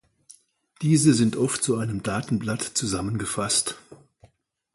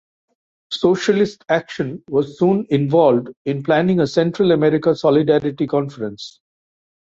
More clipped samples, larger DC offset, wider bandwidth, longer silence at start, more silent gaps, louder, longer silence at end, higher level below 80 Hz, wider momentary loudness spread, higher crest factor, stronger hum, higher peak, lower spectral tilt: neither; neither; first, 12 kHz vs 7.8 kHz; about the same, 0.8 s vs 0.7 s; second, none vs 3.37-3.45 s; second, -24 LUFS vs -18 LUFS; about the same, 0.8 s vs 0.7 s; about the same, -54 dBFS vs -58 dBFS; about the same, 9 LU vs 11 LU; about the same, 20 dB vs 16 dB; neither; second, -6 dBFS vs -2 dBFS; second, -4.5 dB/octave vs -7 dB/octave